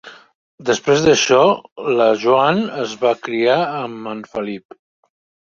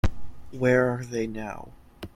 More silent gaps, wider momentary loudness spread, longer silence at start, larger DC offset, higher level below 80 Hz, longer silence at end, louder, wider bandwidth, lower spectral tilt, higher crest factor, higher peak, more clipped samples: first, 0.35-0.58 s, 1.72-1.76 s vs none; second, 14 LU vs 21 LU; about the same, 0.05 s vs 0.05 s; neither; second, -56 dBFS vs -40 dBFS; first, 1 s vs 0.1 s; first, -17 LUFS vs -26 LUFS; second, 7.6 kHz vs 15 kHz; second, -4 dB/octave vs -7 dB/octave; about the same, 16 dB vs 18 dB; first, -2 dBFS vs -8 dBFS; neither